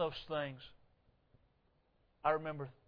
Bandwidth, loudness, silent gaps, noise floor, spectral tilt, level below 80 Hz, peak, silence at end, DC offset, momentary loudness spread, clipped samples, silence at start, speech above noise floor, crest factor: 5.4 kHz; -39 LUFS; none; -75 dBFS; -3.5 dB/octave; -68 dBFS; -20 dBFS; 0.15 s; under 0.1%; 17 LU; under 0.1%; 0 s; 35 dB; 24 dB